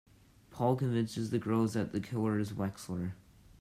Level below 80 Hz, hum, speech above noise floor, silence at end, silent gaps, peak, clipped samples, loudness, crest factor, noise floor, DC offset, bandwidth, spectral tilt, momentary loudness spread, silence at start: -64 dBFS; none; 26 dB; 0.45 s; none; -16 dBFS; under 0.1%; -34 LUFS; 18 dB; -59 dBFS; under 0.1%; 15 kHz; -7 dB/octave; 8 LU; 0.5 s